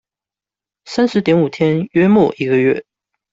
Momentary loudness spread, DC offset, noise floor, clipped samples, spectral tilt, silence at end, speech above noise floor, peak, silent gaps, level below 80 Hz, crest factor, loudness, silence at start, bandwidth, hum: 6 LU; under 0.1%; -89 dBFS; under 0.1%; -7.5 dB/octave; 0.5 s; 75 dB; -2 dBFS; none; -56 dBFS; 14 dB; -15 LUFS; 0.85 s; 7.8 kHz; none